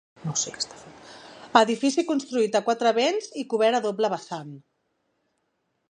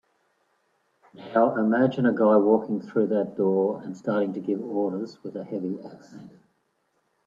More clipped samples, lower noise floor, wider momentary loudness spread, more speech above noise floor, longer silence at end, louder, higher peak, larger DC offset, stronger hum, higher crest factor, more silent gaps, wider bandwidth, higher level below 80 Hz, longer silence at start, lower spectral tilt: neither; about the same, -75 dBFS vs -72 dBFS; first, 20 LU vs 14 LU; about the same, 51 dB vs 48 dB; first, 1.3 s vs 1 s; about the same, -24 LUFS vs -25 LUFS; first, -2 dBFS vs -6 dBFS; neither; neither; about the same, 24 dB vs 20 dB; neither; first, 10 kHz vs 7.4 kHz; about the same, -72 dBFS vs -74 dBFS; second, 0.2 s vs 1.2 s; second, -3.5 dB/octave vs -9 dB/octave